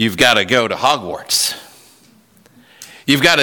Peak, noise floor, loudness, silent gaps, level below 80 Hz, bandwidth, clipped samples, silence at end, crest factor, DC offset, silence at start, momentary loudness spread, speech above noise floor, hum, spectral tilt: 0 dBFS; -50 dBFS; -14 LUFS; none; -52 dBFS; 19 kHz; under 0.1%; 0 s; 16 dB; under 0.1%; 0 s; 10 LU; 35 dB; none; -2.5 dB/octave